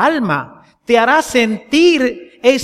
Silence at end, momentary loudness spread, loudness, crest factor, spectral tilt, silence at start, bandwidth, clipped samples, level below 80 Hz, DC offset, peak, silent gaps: 0 s; 8 LU; -14 LUFS; 14 dB; -4 dB/octave; 0 s; 14.5 kHz; under 0.1%; -50 dBFS; under 0.1%; 0 dBFS; none